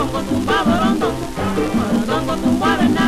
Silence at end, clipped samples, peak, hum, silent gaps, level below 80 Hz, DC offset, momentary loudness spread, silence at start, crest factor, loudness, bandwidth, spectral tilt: 0 s; under 0.1%; -6 dBFS; none; none; -34 dBFS; under 0.1%; 5 LU; 0 s; 12 dB; -18 LUFS; 15 kHz; -5.5 dB/octave